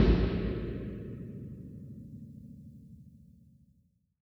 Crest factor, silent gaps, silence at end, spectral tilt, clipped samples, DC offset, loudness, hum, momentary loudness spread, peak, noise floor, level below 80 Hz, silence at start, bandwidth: 22 dB; none; 1.05 s; -9.5 dB/octave; under 0.1%; under 0.1%; -36 LUFS; none; 22 LU; -12 dBFS; -70 dBFS; -38 dBFS; 0 s; 5.8 kHz